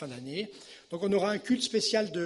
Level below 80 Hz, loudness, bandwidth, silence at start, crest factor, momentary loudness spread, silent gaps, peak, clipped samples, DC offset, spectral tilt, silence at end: -70 dBFS; -30 LUFS; 11.5 kHz; 0 s; 16 dB; 14 LU; none; -14 dBFS; under 0.1%; under 0.1%; -4 dB/octave; 0 s